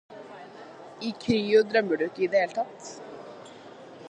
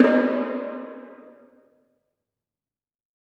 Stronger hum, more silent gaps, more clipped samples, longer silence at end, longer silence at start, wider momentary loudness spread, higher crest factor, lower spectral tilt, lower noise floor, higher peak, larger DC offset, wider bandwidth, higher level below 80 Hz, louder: neither; neither; neither; second, 0 s vs 2.1 s; about the same, 0.1 s vs 0 s; about the same, 23 LU vs 23 LU; about the same, 20 dB vs 24 dB; second, -5 dB/octave vs -7 dB/octave; second, -46 dBFS vs under -90 dBFS; second, -10 dBFS vs -2 dBFS; neither; first, 9.4 kHz vs 5.8 kHz; first, -68 dBFS vs under -90 dBFS; about the same, -26 LUFS vs -24 LUFS